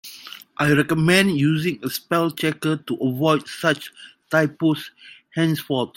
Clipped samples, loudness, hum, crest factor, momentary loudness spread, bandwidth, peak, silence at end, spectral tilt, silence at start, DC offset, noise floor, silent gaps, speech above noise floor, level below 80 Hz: under 0.1%; -21 LUFS; none; 20 dB; 14 LU; 16.5 kHz; -2 dBFS; 0.1 s; -5.5 dB/octave; 0.05 s; under 0.1%; -41 dBFS; none; 20 dB; -58 dBFS